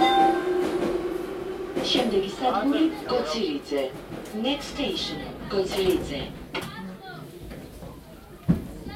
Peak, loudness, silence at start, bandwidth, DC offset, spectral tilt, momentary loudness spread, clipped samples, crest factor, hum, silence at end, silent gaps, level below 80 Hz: -8 dBFS; -26 LUFS; 0 s; 16 kHz; under 0.1%; -5 dB/octave; 18 LU; under 0.1%; 18 dB; none; 0 s; none; -48 dBFS